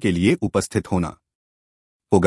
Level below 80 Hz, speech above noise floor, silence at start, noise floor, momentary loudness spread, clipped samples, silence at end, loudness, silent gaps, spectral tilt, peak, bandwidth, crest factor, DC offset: -50 dBFS; over 69 dB; 0 s; under -90 dBFS; 6 LU; under 0.1%; 0 s; -22 LUFS; 1.35-2.00 s; -6 dB/octave; -2 dBFS; 12 kHz; 20 dB; under 0.1%